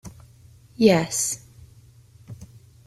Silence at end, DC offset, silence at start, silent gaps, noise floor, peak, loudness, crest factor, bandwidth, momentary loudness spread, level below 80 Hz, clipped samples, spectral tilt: 0.4 s; under 0.1%; 0.05 s; none; -51 dBFS; -4 dBFS; -21 LUFS; 22 dB; 15 kHz; 26 LU; -56 dBFS; under 0.1%; -4.5 dB/octave